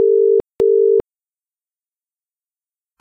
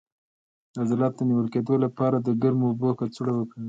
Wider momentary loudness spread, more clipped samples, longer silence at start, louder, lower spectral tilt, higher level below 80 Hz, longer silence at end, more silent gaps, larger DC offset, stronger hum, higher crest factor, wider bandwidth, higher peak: about the same, 3 LU vs 5 LU; neither; second, 0 s vs 0.75 s; first, -15 LUFS vs -25 LUFS; about the same, -9 dB/octave vs -9.5 dB/octave; first, -54 dBFS vs -66 dBFS; first, 2 s vs 0 s; neither; neither; neither; about the same, 12 dB vs 16 dB; second, 3 kHz vs 7.8 kHz; first, -6 dBFS vs -10 dBFS